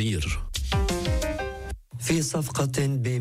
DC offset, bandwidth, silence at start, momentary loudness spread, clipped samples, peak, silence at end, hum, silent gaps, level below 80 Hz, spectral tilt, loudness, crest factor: under 0.1%; 16 kHz; 0 s; 8 LU; under 0.1%; -14 dBFS; 0 s; none; none; -34 dBFS; -5 dB/octave; -27 LUFS; 12 dB